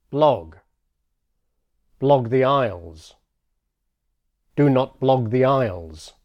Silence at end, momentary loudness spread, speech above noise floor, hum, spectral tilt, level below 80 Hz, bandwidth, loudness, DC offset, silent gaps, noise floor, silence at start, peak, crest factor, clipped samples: 0.15 s; 12 LU; 56 dB; none; -8 dB/octave; -54 dBFS; 10 kHz; -20 LUFS; under 0.1%; none; -75 dBFS; 0.1 s; -4 dBFS; 18 dB; under 0.1%